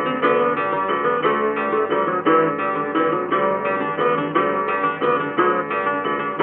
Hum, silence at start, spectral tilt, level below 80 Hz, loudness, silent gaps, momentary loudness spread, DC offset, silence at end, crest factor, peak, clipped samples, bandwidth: none; 0 s; -3.5 dB/octave; -72 dBFS; -20 LUFS; none; 4 LU; under 0.1%; 0 s; 16 dB; -4 dBFS; under 0.1%; 4.1 kHz